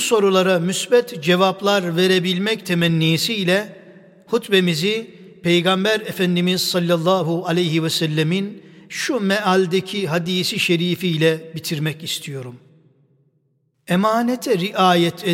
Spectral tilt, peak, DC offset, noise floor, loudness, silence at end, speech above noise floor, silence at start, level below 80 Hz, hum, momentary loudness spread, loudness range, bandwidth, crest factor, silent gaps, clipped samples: -5 dB/octave; -4 dBFS; under 0.1%; -66 dBFS; -19 LUFS; 0 s; 47 dB; 0 s; -66 dBFS; none; 9 LU; 5 LU; 16.5 kHz; 16 dB; none; under 0.1%